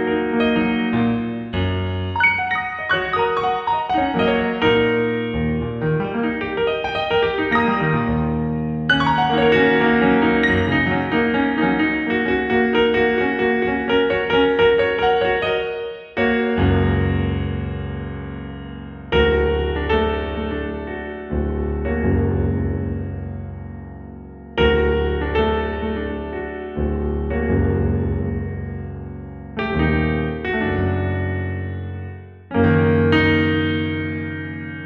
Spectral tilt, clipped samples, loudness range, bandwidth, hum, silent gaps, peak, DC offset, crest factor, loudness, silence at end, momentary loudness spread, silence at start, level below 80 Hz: -8 dB/octave; under 0.1%; 6 LU; 6.6 kHz; none; none; -4 dBFS; under 0.1%; 16 dB; -20 LUFS; 0 s; 13 LU; 0 s; -34 dBFS